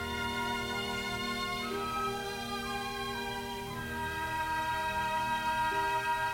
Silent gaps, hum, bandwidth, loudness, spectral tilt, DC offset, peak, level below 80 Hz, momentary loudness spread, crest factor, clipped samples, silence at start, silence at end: none; none; 17 kHz; -34 LUFS; -3.5 dB/octave; under 0.1%; -20 dBFS; -52 dBFS; 6 LU; 14 dB; under 0.1%; 0 s; 0 s